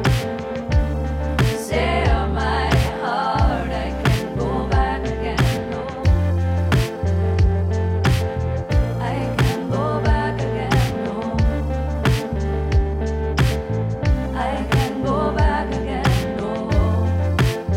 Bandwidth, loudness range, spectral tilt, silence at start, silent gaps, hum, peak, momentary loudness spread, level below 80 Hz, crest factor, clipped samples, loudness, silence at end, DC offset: 16 kHz; 1 LU; -6.5 dB/octave; 0 s; none; none; -4 dBFS; 5 LU; -26 dBFS; 14 dB; under 0.1%; -21 LUFS; 0 s; under 0.1%